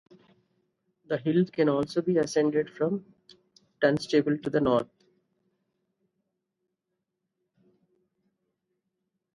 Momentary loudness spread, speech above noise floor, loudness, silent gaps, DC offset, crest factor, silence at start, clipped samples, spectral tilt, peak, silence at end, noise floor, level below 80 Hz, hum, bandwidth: 6 LU; 57 dB; -27 LUFS; none; under 0.1%; 22 dB; 1.1 s; under 0.1%; -6.5 dB/octave; -8 dBFS; 4.5 s; -83 dBFS; -66 dBFS; none; 11.5 kHz